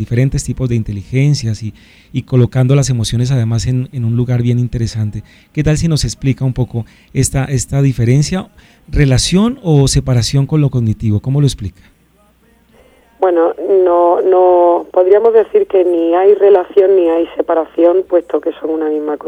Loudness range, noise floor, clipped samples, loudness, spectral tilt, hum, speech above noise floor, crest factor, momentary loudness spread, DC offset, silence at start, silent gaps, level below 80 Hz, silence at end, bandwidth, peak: 6 LU; -51 dBFS; under 0.1%; -13 LUFS; -6.5 dB/octave; none; 39 dB; 12 dB; 9 LU; under 0.1%; 0 s; none; -32 dBFS; 0 s; 14 kHz; 0 dBFS